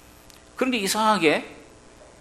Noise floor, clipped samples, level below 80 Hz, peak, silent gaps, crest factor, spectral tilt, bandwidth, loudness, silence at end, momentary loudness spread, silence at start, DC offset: -49 dBFS; under 0.1%; -58 dBFS; -4 dBFS; none; 20 dB; -3 dB/octave; 13 kHz; -22 LUFS; 0.55 s; 20 LU; 0.55 s; under 0.1%